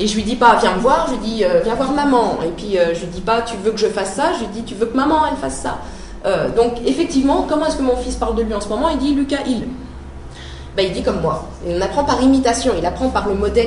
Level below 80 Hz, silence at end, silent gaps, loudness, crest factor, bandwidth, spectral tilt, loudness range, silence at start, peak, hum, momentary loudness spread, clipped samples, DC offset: -32 dBFS; 0 s; none; -17 LUFS; 16 dB; 11 kHz; -5 dB/octave; 4 LU; 0 s; 0 dBFS; none; 11 LU; under 0.1%; under 0.1%